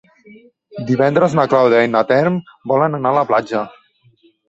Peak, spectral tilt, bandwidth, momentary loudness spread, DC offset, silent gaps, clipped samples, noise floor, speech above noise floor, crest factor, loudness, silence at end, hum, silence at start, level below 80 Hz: -2 dBFS; -7.5 dB/octave; 8 kHz; 11 LU; under 0.1%; none; under 0.1%; -54 dBFS; 39 dB; 16 dB; -15 LUFS; 0.8 s; none; 0.75 s; -58 dBFS